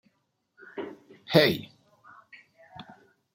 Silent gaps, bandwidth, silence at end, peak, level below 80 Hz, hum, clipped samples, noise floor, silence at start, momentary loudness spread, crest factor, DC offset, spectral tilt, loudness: none; 16.5 kHz; 0.55 s; -4 dBFS; -70 dBFS; none; under 0.1%; -75 dBFS; 0.75 s; 27 LU; 28 dB; under 0.1%; -5.5 dB/octave; -24 LUFS